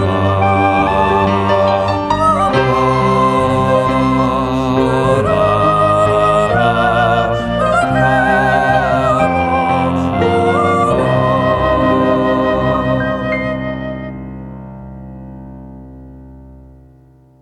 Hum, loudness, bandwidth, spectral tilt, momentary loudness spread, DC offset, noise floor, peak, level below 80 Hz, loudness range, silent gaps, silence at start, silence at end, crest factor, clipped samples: none; -13 LUFS; 12 kHz; -7 dB/octave; 14 LU; under 0.1%; -45 dBFS; 0 dBFS; -32 dBFS; 9 LU; none; 0 s; 0.85 s; 12 dB; under 0.1%